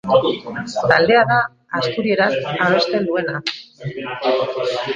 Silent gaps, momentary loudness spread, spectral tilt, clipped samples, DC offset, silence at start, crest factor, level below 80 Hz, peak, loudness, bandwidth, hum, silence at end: none; 13 LU; -5.5 dB/octave; under 0.1%; under 0.1%; 0.05 s; 18 dB; -56 dBFS; 0 dBFS; -18 LUFS; 8.8 kHz; none; 0 s